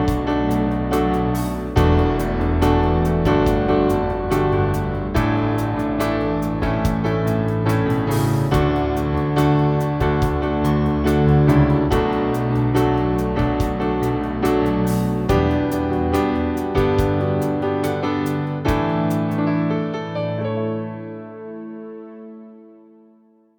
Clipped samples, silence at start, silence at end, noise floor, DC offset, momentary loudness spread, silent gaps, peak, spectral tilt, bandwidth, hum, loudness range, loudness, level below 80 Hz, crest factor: under 0.1%; 0 s; 0.9 s; -54 dBFS; under 0.1%; 7 LU; none; -2 dBFS; -7.5 dB/octave; over 20 kHz; none; 5 LU; -20 LUFS; -30 dBFS; 16 dB